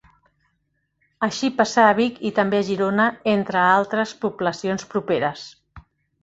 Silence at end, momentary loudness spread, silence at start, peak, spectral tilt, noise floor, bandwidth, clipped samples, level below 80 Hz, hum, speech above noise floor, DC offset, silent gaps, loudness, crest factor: 0.45 s; 10 LU; 1.2 s; -2 dBFS; -5 dB/octave; -72 dBFS; 8 kHz; under 0.1%; -60 dBFS; none; 51 dB; under 0.1%; none; -21 LUFS; 20 dB